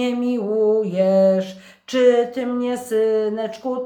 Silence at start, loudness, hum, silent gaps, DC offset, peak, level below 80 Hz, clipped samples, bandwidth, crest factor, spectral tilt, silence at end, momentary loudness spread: 0 s; -19 LUFS; none; none; under 0.1%; -4 dBFS; -70 dBFS; under 0.1%; 18.5 kHz; 14 dB; -6.5 dB/octave; 0 s; 9 LU